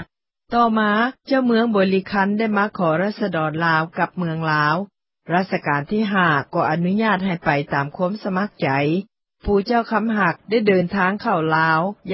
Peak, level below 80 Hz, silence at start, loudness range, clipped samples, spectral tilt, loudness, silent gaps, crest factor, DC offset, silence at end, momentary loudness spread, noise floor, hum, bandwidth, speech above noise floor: -4 dBFS; -48 dBFS; 0 s; 2 LU; under 0.1%; -11 dB/octave; -20 LUFS; none; 16 dB; under 0.1%; 0 s; 6 LU; -44 dBFS; none; 5.8 kHz; 25 dB